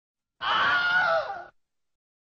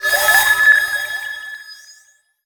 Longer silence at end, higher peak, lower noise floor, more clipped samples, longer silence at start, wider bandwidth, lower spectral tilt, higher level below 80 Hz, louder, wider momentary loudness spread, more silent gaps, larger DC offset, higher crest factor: first, 0.75 s vs 0.55 s; second, -14 dBFS vs -2 dBFS; first, -58 dBFS vs -53 dBFS; neither; first, 0.4 s vs 0 s; second, 7 kHz vs over 20 kHz; about the same, 2 dB/octave vs 2 dB/octave; second, -66 dBFS vs -54 dBFS; second, -24 LUFS vs -13 LUFS; second, 14 LU vs 20 LU; neither; neither; about the same, 14 dB vs 16 dB